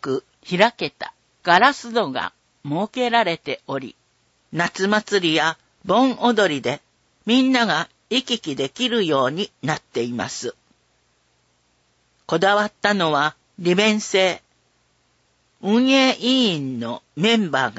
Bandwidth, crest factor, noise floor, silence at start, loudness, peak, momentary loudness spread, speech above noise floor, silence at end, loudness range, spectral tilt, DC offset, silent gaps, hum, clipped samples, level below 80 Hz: 8 kHz; 22 dB; -64 dBFS; 0 s; -20 LUFS; 0 dBFS; 14 LU; 44 dB; 0 s; 5 LU; -4 dB/octave; under 0.1%; none; none; under 0.1%; -66 dBFS